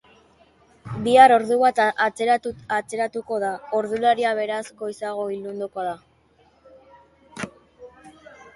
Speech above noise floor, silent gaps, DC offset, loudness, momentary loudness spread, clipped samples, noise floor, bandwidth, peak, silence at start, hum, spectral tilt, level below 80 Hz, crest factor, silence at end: 38 dB; none; under 0.1%; -21 LUFS; 21 LU; under 0.1%; -59 dBFS; 11.5 kHz; -2 dBFS; 0.85 s; none; -4.5 dB/octave; -62 dBFS; 22 dB; 0.45 s